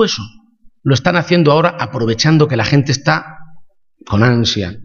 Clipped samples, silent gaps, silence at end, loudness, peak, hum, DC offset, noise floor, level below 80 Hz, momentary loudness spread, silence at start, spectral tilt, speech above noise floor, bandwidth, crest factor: under 0.1%; none; 0 s; -14 LUFS; 0 dBFS; none; under 0.1%; -38 dBFS; -44 dBFS; 8 LU; 0 s; -5.5 dB/octave; 25 dB; 7.2 kHz; 14 dB